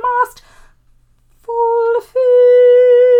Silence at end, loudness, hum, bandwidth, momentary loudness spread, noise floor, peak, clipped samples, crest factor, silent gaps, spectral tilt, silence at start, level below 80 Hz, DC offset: 0 s; -11 LUFS; none; 4.4 kHz; 10 LU; -51 dBFS; -2 dBFS; under 0.1%; 10 dB; none; -3 dB/octave; 0 s; -52 dBFS; under 0.1%